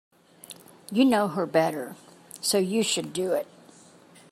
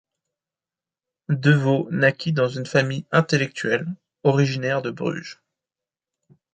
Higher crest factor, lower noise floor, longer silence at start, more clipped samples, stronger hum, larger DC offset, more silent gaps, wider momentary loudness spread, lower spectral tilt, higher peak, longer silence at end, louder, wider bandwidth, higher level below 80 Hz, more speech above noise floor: about the same, 20 dB vs 20 dB; second, -53 dBFS vs under -90 dBFS; second, 0.5 s vs 1.3 s; neither; neither; neither; neither; first, 23 LU vs 9 LU; second, -4 dB/octave vs -6.5 dB/octave; second, -8 dBFS vs -4 dBFS; second, 0.9 s vs 1.2 s; second, -25 LUFS vs -22 LUFS; first, 15.5 kHz vs 8.8 kHz; second, -74 dBFS vs -64 dBFS; second, 29 dB vs over 69 dB